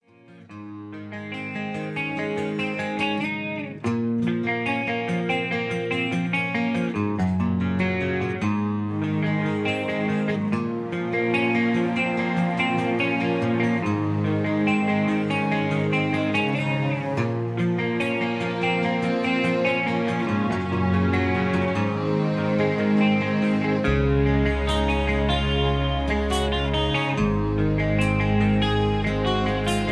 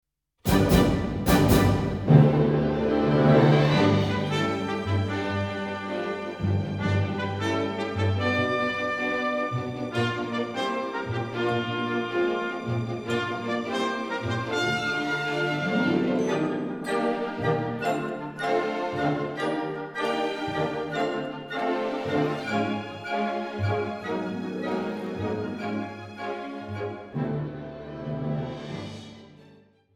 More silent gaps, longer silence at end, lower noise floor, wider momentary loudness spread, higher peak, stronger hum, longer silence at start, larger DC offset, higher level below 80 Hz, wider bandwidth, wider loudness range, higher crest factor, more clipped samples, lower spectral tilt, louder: neither; second, 0 s vs 0.55 s; second, -49 dBFS vs -56 dBFS; second, 5 LU vs 12 LU; second, -10 dBFS vs -4 dBFS; neither; second, 0.3 s vs 0.45 s; neither; first, -36 dBFS vs -44 dBFS; second, 11 kHz vs 18 kHz; second, 3 LU vs 10 LU; second, 14 dB vs 22 dB; neither; about the same, -7 dB/octave vs -6.5 dB/octave; first, -23 LUFS vs -26 LUFS